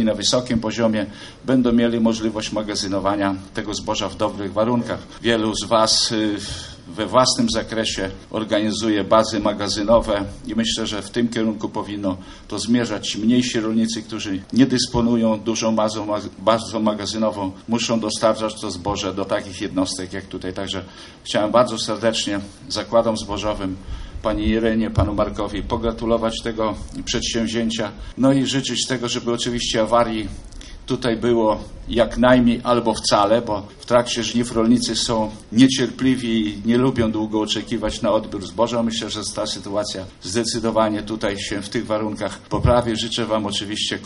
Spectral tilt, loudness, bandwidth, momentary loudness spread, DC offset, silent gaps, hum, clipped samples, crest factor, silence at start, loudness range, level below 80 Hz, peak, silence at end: -4.5 dB/octave; -21 LUFS; 11.5 kHz; 10 LU; under 0.1%; none; none; under 0.1%; 18 dB; 0 s; 4 LU; -40 dBFS; -2 dBFS; 0 s